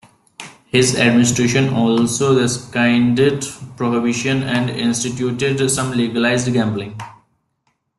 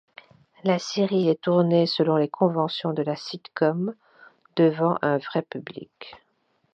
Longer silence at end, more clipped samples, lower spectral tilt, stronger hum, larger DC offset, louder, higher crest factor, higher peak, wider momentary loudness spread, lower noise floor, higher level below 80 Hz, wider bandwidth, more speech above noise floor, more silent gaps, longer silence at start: first, 0.9 s vs 0.6 s; neither; second, -4.5 dB/octave vs -6.5 dB/octave; neither; neither; first, -17 LUFS vs -24 LUFS; about the same, 16 dB vs 18 dB; first, -2 dBFS vs -6 dBFS; about the same, 13 LU vs 15 LU; about the same, -67 dBFS vs -69 dBFS; first, -50 dBFS vs -74 dBFS; first, 12.5 kHz vs 7.6 kHz; first, 51 dB vs 46 dB; neither; second, 0.4 s vs 0.65 s